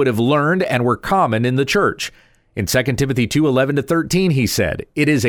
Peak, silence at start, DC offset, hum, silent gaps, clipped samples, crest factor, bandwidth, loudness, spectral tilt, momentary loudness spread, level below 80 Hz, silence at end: -4 dBFS; 0 s; under 0.1%; none; none; under 0.1%; 14 dB; 19.5 kHz; -17 LUFS; -5.5 dB/octave; 4 LU; -42 dBFS; 0 s